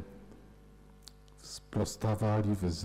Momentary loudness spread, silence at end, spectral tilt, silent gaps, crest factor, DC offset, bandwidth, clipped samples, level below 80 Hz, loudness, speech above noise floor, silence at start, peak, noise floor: 24 LU; 0 s; -6.5 dB/octave; none; 12 dB; under 0.1%; 14.5 kHz; under 0.1%; -54 dBFS; -33 LUFS; 25 dB; 0 s; -24 dBFS; -56 dBFS